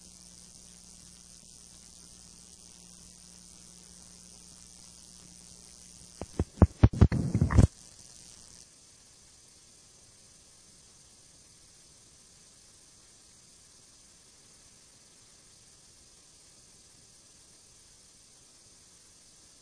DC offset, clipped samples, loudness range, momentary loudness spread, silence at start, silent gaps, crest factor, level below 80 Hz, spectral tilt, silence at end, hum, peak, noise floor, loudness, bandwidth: under 0.1%; under 0.1%; 26 LU; 28 LU; 6.2 s; none; 32 dB; -42 dBFS; -6.5 dB/octave; 11.95 s; none; -2 dBFS; -57 dBFS; -26 LUFS; 10.5 kHz